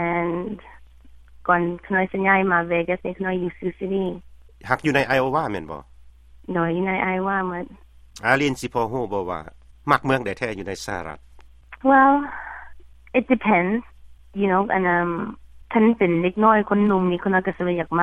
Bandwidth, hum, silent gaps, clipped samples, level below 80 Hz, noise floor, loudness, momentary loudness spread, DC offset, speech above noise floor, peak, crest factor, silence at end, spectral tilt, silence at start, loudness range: 13.5 kHz; none; none; under 0.1%; -50 dBFS; -47 dBFS; -21 LUFS; 15 LU; under 0.1%; 26 dB; -2 dBFS; 20 dB; 0 s; -6.5 dB/octave; 0 s; 4 LU